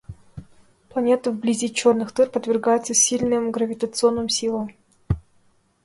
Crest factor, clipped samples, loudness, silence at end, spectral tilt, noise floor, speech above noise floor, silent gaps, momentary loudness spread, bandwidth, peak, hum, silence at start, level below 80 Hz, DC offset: 18 dB; under 0.1%; -21 LUFS; 0.65 s; -3.5 dB/octave; -60 dBFS; 40 dB; none; 11 LU; 11.5 kHz; -6 dBFS; none; 0.1 s; -46 dBFS; under 0.1%